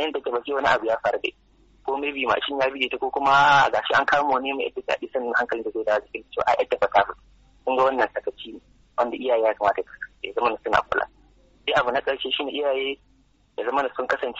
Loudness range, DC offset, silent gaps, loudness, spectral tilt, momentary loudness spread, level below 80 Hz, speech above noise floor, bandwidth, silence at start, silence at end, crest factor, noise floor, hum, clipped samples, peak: 4 LU; under 0.1%; none; -23 LUFS; -0.5 dB/octave; 12 LU; -58 dBFS; 37 dB; 8 kHz; 0 s; 0 s; 20 dB; -60 dBFS; none; under 0.1%; -4 dBFS